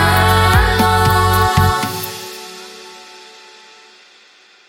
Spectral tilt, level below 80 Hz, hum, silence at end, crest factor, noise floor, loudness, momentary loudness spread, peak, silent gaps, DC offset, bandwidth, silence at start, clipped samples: -4.5 dB/octave; -28 dBFS; none; 1.65 s; 16 dB; -47 dBFS; -13 LUFS; 22 LU; 0 dBFS; none; under 0.1%; 17 kHz; 0 s; under 0.1%